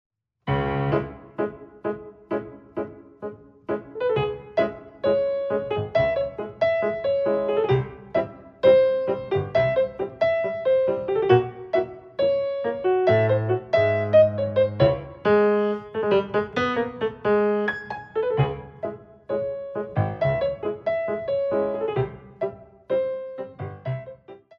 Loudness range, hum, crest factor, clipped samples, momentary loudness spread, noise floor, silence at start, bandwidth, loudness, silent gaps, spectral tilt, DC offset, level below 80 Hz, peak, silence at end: 8 LU; none; 20 dB; under 0.1%; 14 LU; -44 dBFS; 0.45 s; 6.2 kHz; -24 LUFS; none; -8.5 dB/octave; under 0.1%; -52 dBFS; -4 dBFS; 0.2 s